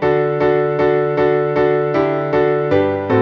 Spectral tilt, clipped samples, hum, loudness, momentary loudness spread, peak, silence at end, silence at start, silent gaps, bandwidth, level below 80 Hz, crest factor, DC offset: -9 dB/octave; under 0.1%; none; -16 LUFS; 1 LU; -2 dBFS; 0 s; 0 s; none; 6.2 kHz; -48 dBFS; 12 dB; under 0.1%